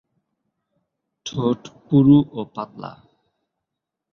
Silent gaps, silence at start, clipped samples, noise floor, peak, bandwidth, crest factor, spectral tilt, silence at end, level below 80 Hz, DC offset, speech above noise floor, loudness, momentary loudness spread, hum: none; 1.25 s; under 0.1%; -83 dBFS; -4 dBFS; 6.8 kHz; 20 dB; -8 dB/octave; 1.2 s; -56 dBFS; under 0.1%; 64 dB; -19 LUFS; 22 LU; none